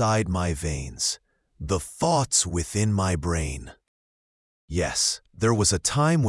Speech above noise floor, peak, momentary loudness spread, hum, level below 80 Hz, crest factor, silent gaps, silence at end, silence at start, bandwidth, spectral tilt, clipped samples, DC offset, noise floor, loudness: over 66 dB; -6 dBFS; 10 LU; none; -42 dBFS; 20 dB; 3.88-4.68 s; 0 s; 0 s; 12 kHz; -4 dB/octave; under 0.1%; under 0.1%; under -90 dBFS; -24 LUFS